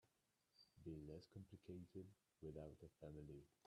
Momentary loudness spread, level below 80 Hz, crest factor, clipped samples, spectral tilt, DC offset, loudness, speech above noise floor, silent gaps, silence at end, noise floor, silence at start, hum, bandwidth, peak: 5 LU; -74 dBFS; 18 dB; under 0.1%; -8 dB/octave; under 0.1%; -60 LUFS; 28 dB; none; 0.2 s; -87 dBFS; 0.05 s; none; 12.5 kHz; -42 dBFS